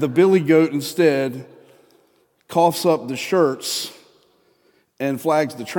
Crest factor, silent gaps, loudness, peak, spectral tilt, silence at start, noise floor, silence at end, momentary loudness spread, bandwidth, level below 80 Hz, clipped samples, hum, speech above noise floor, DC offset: 18 dB; none; -19 LUFS; -4 dBFS; -5 dB/octave; 0 s; -61 dBFS; 0 s; 11 LU; 17.5 kHz; -74 dBFS; under 0.1%; none; 42 dB; under 0.1%